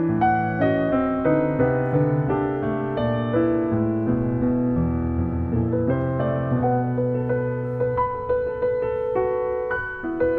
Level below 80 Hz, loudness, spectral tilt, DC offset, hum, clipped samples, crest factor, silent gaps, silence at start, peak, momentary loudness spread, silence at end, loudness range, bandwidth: -40 dBFS; -23 LUFS; -11 dB/octave; under 0.1%; none; under 0.1%; 16 dB; none; 0 s; -6 dBFS; 4 LU; 0 s; 2 LU; 4.3 kHz